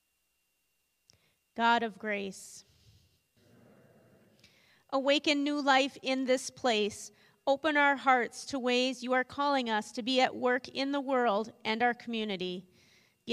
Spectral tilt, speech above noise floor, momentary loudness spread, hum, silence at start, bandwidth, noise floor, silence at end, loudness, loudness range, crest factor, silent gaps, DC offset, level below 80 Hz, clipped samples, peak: -3 dB/octave; 48 dB; 11 LU; none; 1.55 s; 13.5 kHz; -78 dBFS; 0 s; -30 LUFS; 7 LU; 20 dB; none; under 0.1%; -78 dBFS; under 0.1%; -12 dBFS